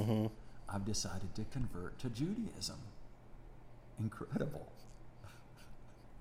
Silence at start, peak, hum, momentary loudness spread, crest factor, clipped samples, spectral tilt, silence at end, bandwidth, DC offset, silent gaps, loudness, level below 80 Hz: 0 s; -22 dBFS; none; 20 LU; 20 dB; under 0.1%; -5.5 dB/octave; 0 s; 16 kHz; under 0.1%; none; -42 LUFS; -54 dBFS